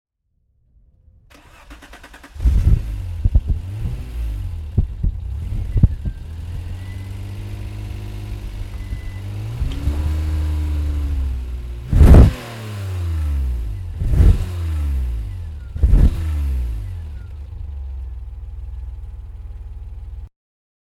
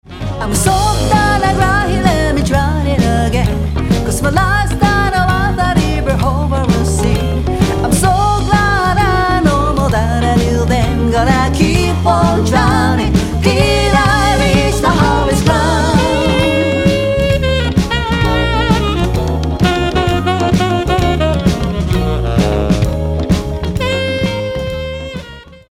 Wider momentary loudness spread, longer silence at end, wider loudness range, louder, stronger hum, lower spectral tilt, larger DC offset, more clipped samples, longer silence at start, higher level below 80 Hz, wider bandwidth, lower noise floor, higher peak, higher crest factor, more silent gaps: first, 18 LU vs 5 LU; first, 0.6 s vs 0.15 s; first, 13 LU vs 3 LU; second, -21 LUFS vs -13 LUFS; neither; first, -8 dB/octave vs -5.5 dB/octave; neither; neither; first, 1.6 s vs 0.1 s; about the same, -20 dBFS vs -20 dBFS; second, 13 kHz vs 16 kHz; first, -66 dBFS vs -33 dBFS; about the same, 0 dBFS vs 0 dBFS; first, 20 dB vs 12 dB; neither